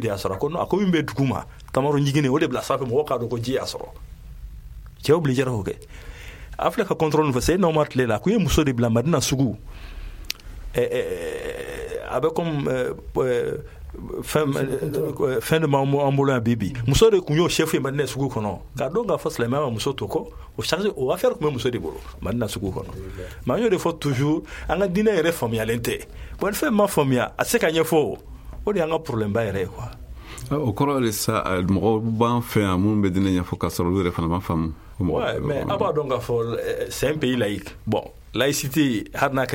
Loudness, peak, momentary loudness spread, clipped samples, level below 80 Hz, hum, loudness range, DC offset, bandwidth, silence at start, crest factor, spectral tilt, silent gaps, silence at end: -23 LUFS; -4 dBFS; 13 LU; under 0.1%; -40 dBFS; none; 5 LU; under 0.1%; 17 kHz; 0 s; 20 dB; -5.5 dB/octave; none; 0 s